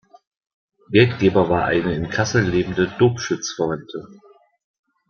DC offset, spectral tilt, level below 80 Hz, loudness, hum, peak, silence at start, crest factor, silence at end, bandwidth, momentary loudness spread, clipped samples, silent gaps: under 0.1%; -5.5 dB/octave; -48 dBFS; -19 LUFS; none; -2 dBFS; 0.9 s; 20 dB; 0.95 s; 7 kHz; 8 LU; under 0.1%; none